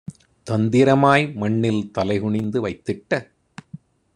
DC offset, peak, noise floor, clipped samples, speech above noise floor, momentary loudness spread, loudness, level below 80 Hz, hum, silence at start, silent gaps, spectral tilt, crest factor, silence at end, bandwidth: under 0.1%; -2 dBFS; -43 dBFS; under 0.1%; 24 dB; 14 LU; -20 LUFS; -56 dBFS; none; 0.1 s; none; -7 dB/octave; 18 dB; 0.4 s; 11 kHz